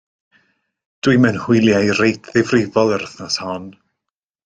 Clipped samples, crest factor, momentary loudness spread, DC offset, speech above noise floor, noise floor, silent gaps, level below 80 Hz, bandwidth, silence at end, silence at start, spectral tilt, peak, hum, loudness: under 0.1%; 16 dB; 9 LU; under 0.1%; 66 dB; -82 dBFS; none; -54 dBFS; 9.4 kHz; 0.75 s; 1.05 s; -5.5 dB/octave; -2 dBFS; none; -16 LUFS